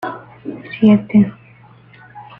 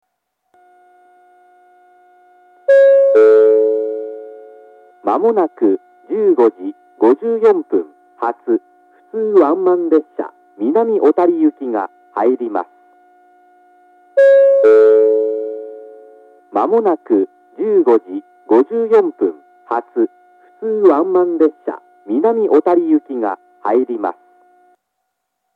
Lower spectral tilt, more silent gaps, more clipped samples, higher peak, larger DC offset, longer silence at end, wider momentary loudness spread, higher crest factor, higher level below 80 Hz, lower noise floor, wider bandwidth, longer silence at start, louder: first, -10 dB/octave vs -8 dB/octave; neither; neither; about the same, -2 dBFS vs 0 dBFS; neither; second, 0.15 s vs 1.45 s; about the same, 19 LU vs 17 LU; about the same, 16 dB vs 14 dB; first, -54 dBFS vs -84 dBFS; second, -45 dBFS vs -73 dBFS; second, 3.9 kHz vs 4.4 kHz; second, 0.05 s vs 2.7 s; about the same, -14 LUFS vs -14 LUFS